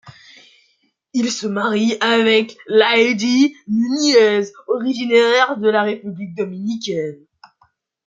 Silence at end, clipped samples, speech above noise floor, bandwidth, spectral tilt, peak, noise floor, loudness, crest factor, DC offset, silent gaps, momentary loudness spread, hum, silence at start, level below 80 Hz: 0.9 s; under 0.1%; 47 dB; 7.8 kHz; -4 dB/octave; -2 dBFS; -63 dBFS; -17 LUFS; 16 dB; under 0.1%; none; 12 LU; none; 0.05 s; -68 dBFS